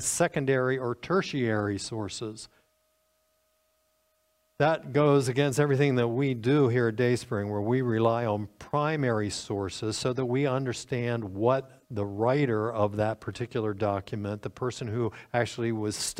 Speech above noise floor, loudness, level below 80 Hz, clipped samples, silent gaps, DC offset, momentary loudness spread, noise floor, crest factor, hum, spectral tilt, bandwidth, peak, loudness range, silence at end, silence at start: 44 dB; -28 LUFS; -62 dBFS; under 0.1%; none; under 0.1%; 10 LU; -72 dBFS; 18 dB; none; -5.5 dB/octave; 16 kHz; -10 dBFS; 7 LU; 0 s; 0 s